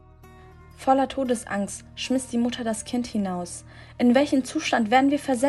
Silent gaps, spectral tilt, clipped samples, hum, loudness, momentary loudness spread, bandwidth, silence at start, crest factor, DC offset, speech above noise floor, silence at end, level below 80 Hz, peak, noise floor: none; -4.5 dB/octave; under 0.1%; none; -24 LUFS; 12 LU; 12.5 kHz; 0.25 s; 20 dB; under 0.1%; 25 dB; 0 s; -54 dBFS; -4 dBFS; -48 dBFS